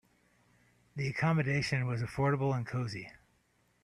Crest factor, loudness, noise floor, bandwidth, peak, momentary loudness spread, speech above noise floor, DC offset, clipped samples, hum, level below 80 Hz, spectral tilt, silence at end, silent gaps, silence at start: 18 dB; -33 LUFS; -72 dBFS; 11 kHz; -16 dBFS; 12 LU; 40 dB; under 0.1%; under 0.1%; 60 Hz at -50 dBFS; -62 dBFS; -6.5 dB/octave; 0.7 s; none; 0.95 s